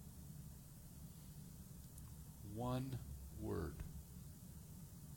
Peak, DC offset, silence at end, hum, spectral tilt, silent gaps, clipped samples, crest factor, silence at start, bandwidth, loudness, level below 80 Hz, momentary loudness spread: -32 dBFS; under 0.1%; 0 s; none; -6.5 dB/octave; none; under 0.1%; 18 dB; 0 s; over 20 kHz; -51 LUFS; -60 dBFS; 12 LU